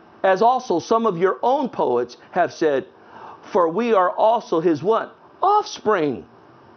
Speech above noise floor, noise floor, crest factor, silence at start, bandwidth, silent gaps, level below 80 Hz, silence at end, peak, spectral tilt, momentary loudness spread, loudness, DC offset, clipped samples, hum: 22 dB; -41 dBFS; 16 dB; 0.25 s; 6.6 kHz; none; -68 dBFS; 0.55 s; -4 dBFS; -5.5 dB/octave; 7 LU; -20 LUFS; under 0.1%; under 0.1%; none